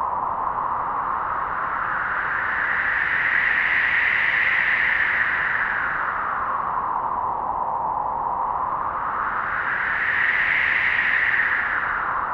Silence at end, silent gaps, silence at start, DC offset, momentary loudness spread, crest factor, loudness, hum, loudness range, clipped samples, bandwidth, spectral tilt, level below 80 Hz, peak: 0 s; none; 0 s; under 0.1%; 7 LU; 16 dB; -21 LUFS; none; 6 LU; under 0.1%; 7 kHz; -4.5 dB/octave; -50 dBFS; -6 dBFS